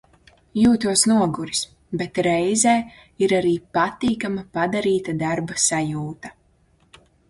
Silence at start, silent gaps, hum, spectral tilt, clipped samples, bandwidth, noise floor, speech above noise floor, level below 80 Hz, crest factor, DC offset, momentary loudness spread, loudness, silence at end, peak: 0.55 s; none; none; -4 dB/octave; under 0.1%; 11.5 kHz; -60 dBFS; 39 dB; -54 dBFS; 18 dB; under 0.1%; 13 LU; -21 LUFS; 1 s; -2 dBFS